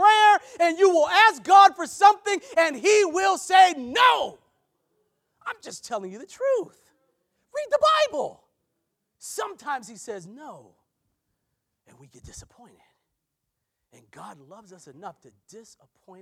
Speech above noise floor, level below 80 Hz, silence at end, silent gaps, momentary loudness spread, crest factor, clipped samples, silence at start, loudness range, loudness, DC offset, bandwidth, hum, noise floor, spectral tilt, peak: 58 dB; -66 dBFS; 0.6 s; none; 22 LU; 20 dB; under 0.1%; 0 s; 19 LU; -20 LUFS; under 0.1%; 15.5 kHz; none; -81 dBFS; -1.5 dB/octave; -4 dBFS